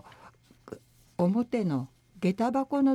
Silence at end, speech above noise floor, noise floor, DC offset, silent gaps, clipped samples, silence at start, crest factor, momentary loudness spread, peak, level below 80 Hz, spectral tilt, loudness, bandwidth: 0 s; 30 dB; -56 dBFS; under 0.1%; none; under 0.1%; 0.25 s; 14 dB; 21 LU; -14 dBFS; -68 dBFS; -8.5 dB/octave; -29 LUFS; 12 kHz